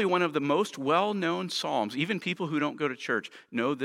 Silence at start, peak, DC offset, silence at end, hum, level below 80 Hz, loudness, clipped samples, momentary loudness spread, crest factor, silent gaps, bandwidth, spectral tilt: 0 s; -10 dBFS; under 0.1%; 0 s; none; -82 dBFS; -29 LUFS; under 0.1%; 5 LU; 18 dB; none; 16 kHz; -5 dB/octave